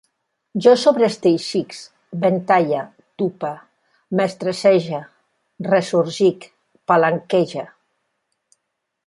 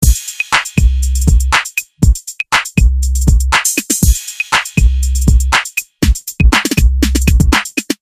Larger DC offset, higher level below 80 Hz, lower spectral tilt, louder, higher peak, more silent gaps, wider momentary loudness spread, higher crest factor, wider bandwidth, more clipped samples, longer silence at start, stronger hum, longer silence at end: second, under 0.1% vs 0.1%; second, -68 dBFS vs -14 dBFS; first, -6 dB/octave vs -3.5 dB/octave; second, -18 LUFS vs -13 LUFS; about the same, -2 dBFS vs 0 dBFS; neither; first, 17 LU vs 4 LU; first, 18 dB vs 12 dB; second, 11.5 kHz vs 16 kHz; second, under 0.1% vs 0.3%; first, 0.55 s vs 0 s; neither; first, 1.4 s vs 0.05 s